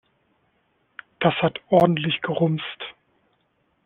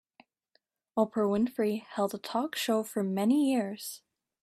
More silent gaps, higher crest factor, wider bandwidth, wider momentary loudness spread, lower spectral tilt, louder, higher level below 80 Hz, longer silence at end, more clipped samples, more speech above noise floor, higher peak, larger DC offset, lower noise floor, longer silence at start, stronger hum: neither; about the same, 22 dB vs 18 dB; second, 4.6 kHz vs 15.5 kHz; first, 19 LU vs 10 LU; about the same, -4.5 dB/octave vs -5 dB/octave; first, -22 LUFS vs -30 LUFS; first, -62 dBFS vs -74 dBFS; first, 0.95 s vs 0.45 s; neither; about the same, 47 dB vs 45 dB; first, -4 dBFS vs -14 dBFS; neither; second, -68 dBFS vs -74 dBFS; first, 1.2 s vs 0.95 s; neither